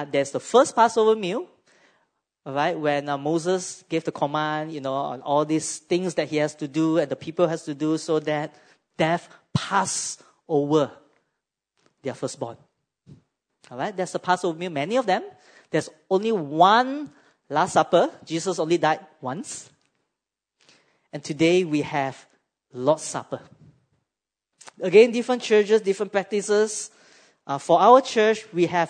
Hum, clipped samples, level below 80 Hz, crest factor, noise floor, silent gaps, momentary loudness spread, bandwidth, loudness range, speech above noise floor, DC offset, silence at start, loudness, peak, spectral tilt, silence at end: none; under 0.1%; -70 dBFS; 22 dB; -86 dBFS; none; 15 LU; 9.6 kHz; 7 LU; 63 dB; under 0.1%; 0 s; -23 LUFS; -2 dBFS; -4.5 dB/octave; 0 s